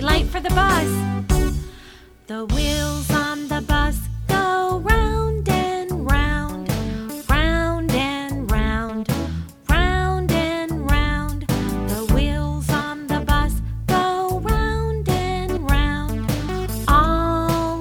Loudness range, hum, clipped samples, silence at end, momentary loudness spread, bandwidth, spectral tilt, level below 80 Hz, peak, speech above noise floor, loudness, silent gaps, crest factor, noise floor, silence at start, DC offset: 2 LU; none; under 0.1%; 0 s; 7 LU; 19 kHz; -5.5 dB/octave; -24 dBFS; -2 dBFS; 25 dB; -21 LUFS; none; 18 dB; -44 dBFS; 0 s; under 0.1%